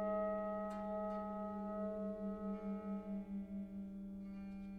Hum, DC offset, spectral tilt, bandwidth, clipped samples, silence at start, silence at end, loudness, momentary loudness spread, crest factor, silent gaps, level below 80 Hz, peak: none; under 0.1%; -9.5 dB/octave; 4.9 kHz; under 0.1%; 0 s; 0 s; -44 LUFS; 8 LU; 14 dB; none; -64 dBFS; -30 dBFS